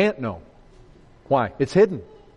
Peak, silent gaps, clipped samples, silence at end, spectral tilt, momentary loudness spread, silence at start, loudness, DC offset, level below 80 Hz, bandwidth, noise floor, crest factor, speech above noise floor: -6 dBFS; none; under 0.1%; 0.35 s; -7 dB/octave; 16 LU; 0 s; -22 LUFS; under 0.1%; -54 dBFS; 9.4 kHz; -49 dBFS; 18 dB; 28 dB